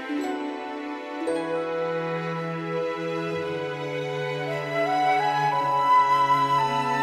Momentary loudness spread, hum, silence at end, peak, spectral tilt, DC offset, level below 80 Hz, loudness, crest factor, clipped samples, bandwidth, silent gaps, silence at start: 10 LU; none; 0 s; -10 dBFS; -5.5 dB/octave; under 0.1%; -68 dBFS; -25 LUFS; 14 dB; under 0.1%; 15.5 kHz; none; 0 s